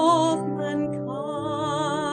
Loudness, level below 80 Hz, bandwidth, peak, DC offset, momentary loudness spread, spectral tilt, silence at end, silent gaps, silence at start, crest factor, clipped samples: -26 LUFS; -62 dBFS; 9.8 kHz; -8 dBFS; under 0.1%; 8 LU; -5.5 dB/octave; 0 s; none; 0 s; 16 dB; under 0.1%